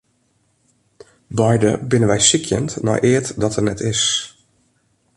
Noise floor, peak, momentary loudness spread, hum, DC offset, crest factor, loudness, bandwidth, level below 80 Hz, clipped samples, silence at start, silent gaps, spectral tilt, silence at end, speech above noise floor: -63 dBFS; 0 dBFS; 8 LU; none; under 0.1%; 18 dB; -17 LUFS; 11.5 kHz; -46 dBFS; under 0.1%; 1.3 s; none; -4 dB/octave; 0.85 s; 46 dB